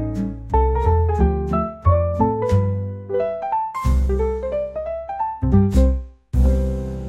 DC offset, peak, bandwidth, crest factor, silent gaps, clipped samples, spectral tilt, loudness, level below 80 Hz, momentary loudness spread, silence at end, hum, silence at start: 0.1%; -4 dBFS; 8.2 kHz; 14 dB; none; under 0.1%; -9.5 dB/octave; -21 LUFS; -22 dBFS; 8 LU; 0 s; none; 0 s